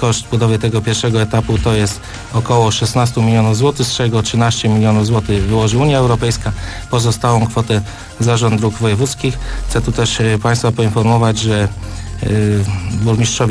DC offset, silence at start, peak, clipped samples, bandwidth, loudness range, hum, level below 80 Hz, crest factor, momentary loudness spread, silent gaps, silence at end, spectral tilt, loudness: under 0.1%; 0 s; 0 dBFS; under 0.1%; 11 kHz; 2 LU; none; -30 dBFS; 12 dB; 7 LU; none; 0 s; -5.5 dB/octave; -14 LUFS